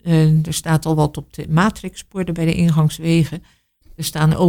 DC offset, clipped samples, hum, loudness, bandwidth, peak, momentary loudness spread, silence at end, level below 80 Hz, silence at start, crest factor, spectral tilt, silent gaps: under 0.1%; under 0.1%; none; -18 LUFS; 17 kHz; -2 dBFS; 12 LU; 0 s; -40 dBFS; 0.05 s; 14 dB; -6.5 dB/octave; none